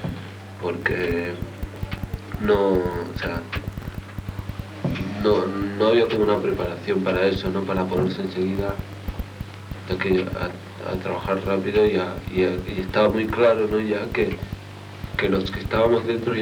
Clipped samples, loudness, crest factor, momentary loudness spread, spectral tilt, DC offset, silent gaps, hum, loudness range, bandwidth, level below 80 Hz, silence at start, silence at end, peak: under 0.1%; -23 LUFS; 18 dB; 15 LU; -7 dB/octave; under 0.1%; none; none; 4 LU; 17.5 kHz; -40 dBFS; 0 s; 0 s; -4 dBFS